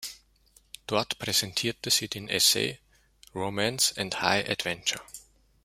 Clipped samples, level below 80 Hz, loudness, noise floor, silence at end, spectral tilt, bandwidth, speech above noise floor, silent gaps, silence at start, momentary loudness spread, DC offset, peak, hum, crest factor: under 0.1%; -62 dBFS; -26 LUFS; -62 dBFS; 0.45 s; -1.5 dB/octave; 16 kHz; 34 dB; none; 0 s; 19 LU; under 0.1%; -6 dBFS; none; 26 dB